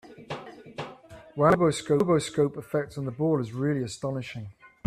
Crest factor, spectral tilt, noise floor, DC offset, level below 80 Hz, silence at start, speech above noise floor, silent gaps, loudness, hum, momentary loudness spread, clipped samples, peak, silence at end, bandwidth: 20 dB; -6.5 dB/octave; -48 dBFS; under 0.1%; -58 dBFS; 0.05 s; 22 dB; none; -26 LUFS; none; 18 LU; under 0.1%; -8 dBFS; 0.2 s; 14 kHz